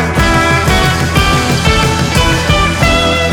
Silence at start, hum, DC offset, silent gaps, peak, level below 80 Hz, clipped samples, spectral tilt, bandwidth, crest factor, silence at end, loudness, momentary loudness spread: 0 s; none; under 0.1%; none; 0 dBFS; -18 dBFS; under 0.1%; -4.5 dB/octave; 19 kHz; 10 dB; 0 s; -10 LUFS; 1 LU